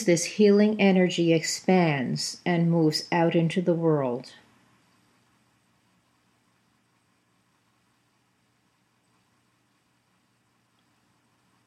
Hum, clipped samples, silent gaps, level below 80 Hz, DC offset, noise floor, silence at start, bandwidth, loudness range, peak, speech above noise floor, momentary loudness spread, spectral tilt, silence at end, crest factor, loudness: none; under 0.1%; none; -78 dBFS; under 0.1%; -69 dBFS; 0 s; 14 kHz; 10 LU; -8 dBFS; 46 dB; 8 LU; -5.5 dB/octave; 7.35 s; 20 dB; -23 LUFS